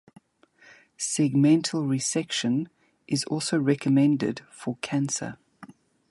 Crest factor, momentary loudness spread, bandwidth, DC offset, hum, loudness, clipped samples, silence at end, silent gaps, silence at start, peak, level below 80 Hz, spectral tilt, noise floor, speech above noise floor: 16 dB; 13 LU; 11.5 kHz; under 0.1%; none; -25 LUFS; under 0.1%; 0.4 s; none; 1 s; -10 dBFS; -70 dBFS; -5 dB/octave; -59 dBFS; 34 dB